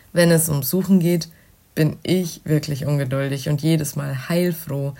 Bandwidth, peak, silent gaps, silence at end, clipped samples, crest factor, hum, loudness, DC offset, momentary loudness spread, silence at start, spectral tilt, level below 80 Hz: 16.5 kHz; -4 dBFS; none; 0.05 s; under 0.1%; 16 dB; none; -20 LUFS; under 0.1%; 8 LU; 0.15 s; -6 dB/octave; -54 dBFS